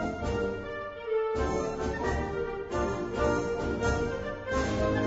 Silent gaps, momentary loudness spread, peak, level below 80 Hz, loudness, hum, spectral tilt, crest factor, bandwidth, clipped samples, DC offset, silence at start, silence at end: none; 5 LU; -14 dBFS; -40 dBFS; -31 LUFS; none; -6 dB/octave; 16 dB; 8 kHz; under 0.1%; under 0.1%; 0 s; 0 s